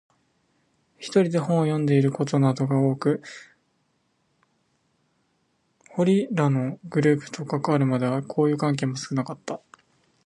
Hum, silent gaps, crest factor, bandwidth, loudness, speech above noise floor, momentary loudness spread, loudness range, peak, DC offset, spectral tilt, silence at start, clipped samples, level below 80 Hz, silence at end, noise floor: none; none; 18 dB; 11 kHz; -24 LUFS; 47 dB; 12 LU; 6 LU; -6 dBFS; under 0.1%; -7.5 dB/octave; 1 s; under 0.1%; -70 dBFS; 0.7 s; -70 dBFS